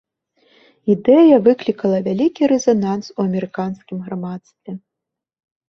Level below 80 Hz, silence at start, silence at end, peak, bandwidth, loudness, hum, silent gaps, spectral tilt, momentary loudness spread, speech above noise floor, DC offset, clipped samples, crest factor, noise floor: -60 dBFS; 0.85 s; 0.9 s; -2 dBFS; 7.2 kHz; -17 LUFS; none; none; -7 dB/octave; 21 LU; 67 dB; under 0.1%; under 0.1%; 16 dB; -83 dBFS